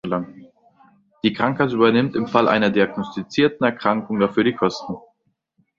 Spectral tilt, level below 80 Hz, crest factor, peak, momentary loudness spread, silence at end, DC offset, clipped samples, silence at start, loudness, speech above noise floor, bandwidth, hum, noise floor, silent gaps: -6.5 dB/octave; -58 dBFS; 20 dB; -2 dBFS; 11 LU; 0.8 s; under 0.1%; under 0.1%; 0.05 s; -20 LUFS; 49 dB; 7.4 kHz; none; -68 dBFS; none